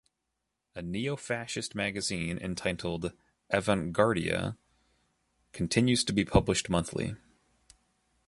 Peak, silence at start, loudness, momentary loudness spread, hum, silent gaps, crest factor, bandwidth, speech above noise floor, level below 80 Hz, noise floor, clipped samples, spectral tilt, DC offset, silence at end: -6 dBFS; 0.75 s; -30 LUFS; 12 LU; none; none; 26 dB; 11.5 kHz; 53 dB; -48 dBFS; -83 dBFS; under 0.1%; -4.5 dB/octave; under 0.1%; 1.1 s